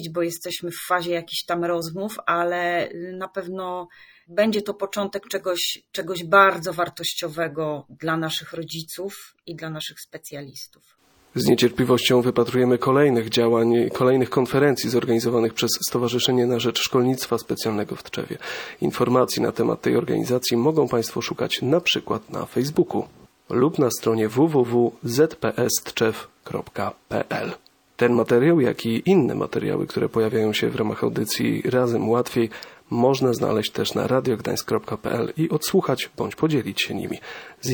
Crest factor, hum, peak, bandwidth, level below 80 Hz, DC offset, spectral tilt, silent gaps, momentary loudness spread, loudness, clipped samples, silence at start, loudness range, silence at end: 20 dB; none; -2 dBFS; 19 kHz; -60 dBFS; under 0.1%; -5 dB/octave; none; 13 LU; -22 LUFS; under 0.1%; 0 s; 7 LU; 0 s